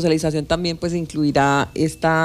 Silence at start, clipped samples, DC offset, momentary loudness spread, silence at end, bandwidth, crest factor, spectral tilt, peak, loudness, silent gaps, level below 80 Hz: 0 s; under 0.1%; under 0.1%; 6 LU; 0 s; 14.5 kHz; 14 dB; -5.5 dB/octave; -6 dBFS; -20 LUFS; none; -42 dBFS